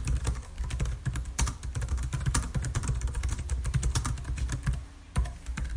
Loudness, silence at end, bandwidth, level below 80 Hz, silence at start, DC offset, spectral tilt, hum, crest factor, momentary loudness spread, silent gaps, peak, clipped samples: -33 LUFS; 0 s; 15.5 kHz; -32 dBFS; 0 s; under 0.1%; -4.5 dB/octave; none; 22 dB; 6 LU; none; -8 dBFS; under 0.1%